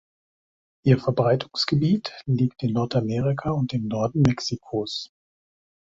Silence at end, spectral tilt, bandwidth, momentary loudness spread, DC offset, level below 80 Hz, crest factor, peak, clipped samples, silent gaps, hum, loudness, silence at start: 0.9 s; -7 dB/octave; 7.8 kHz; 7 LU; under 0.1%; -52 dBFS; 20 dB; -6 dBFS; under 0.1%; none; none; -24 LUFS; 0.85 s